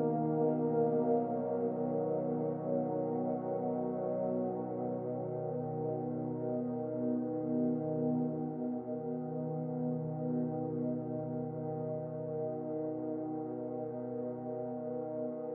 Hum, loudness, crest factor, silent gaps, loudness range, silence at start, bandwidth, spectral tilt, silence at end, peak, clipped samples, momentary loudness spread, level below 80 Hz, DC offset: none; -36 LUFS; 16 dB; none; 5 LU; 0 s; 2.4 kHz; -13 dB/octave; 0 s; -20 dBFS; under 0.1%; 7 LU; -76 dBFS; under 0.1%